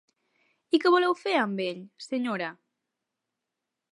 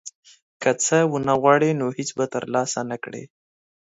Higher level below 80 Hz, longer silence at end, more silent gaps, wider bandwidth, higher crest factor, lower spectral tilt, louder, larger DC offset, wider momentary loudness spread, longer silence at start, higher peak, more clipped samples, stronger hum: second, -86 dBFS vs -64 dBFS; first, 1.4 s vs 0.7 s; second, none vs 0.15-0.23 s, 0.42-0.60 s; first, 11 kHz vs 8 kHz; about the same, 20 dB vs 20 dB; about the same, -5.5 dB/octave vs -4.5 dB/octave; second, -27 LUFS vs -21 LUFS; neither; second, 12 LU vs 15 LU; first, 0.75 s vs 0.05 s; second, -10 dBFS vs -2 dBFS; neither; neither